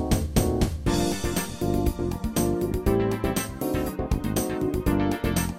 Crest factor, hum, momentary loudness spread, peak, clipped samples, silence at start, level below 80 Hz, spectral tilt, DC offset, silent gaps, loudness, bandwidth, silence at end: 18 dB; none; 4 LU; -8 dBFS; under 0.1%; 0 s; -32 dBFS; -5.5 dB/octave; under 0.1%; none; -26 LUFS; 17 kHz; 0 s